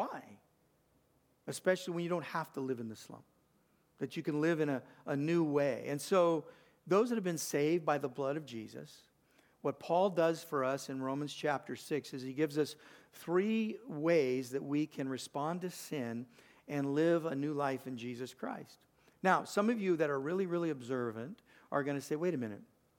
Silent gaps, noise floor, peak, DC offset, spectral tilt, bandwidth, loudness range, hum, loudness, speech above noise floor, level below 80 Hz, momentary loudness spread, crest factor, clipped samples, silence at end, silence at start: none; -73 dBFS; -14 dBFS; under 0.1%; -5.5 dB/octave; 19 kHz; 5 LU; none; -36 LUFS; 38 dB; -84 dBFS; 14 LU; 22 dB; under 0.1%; 0.35 s; 0 s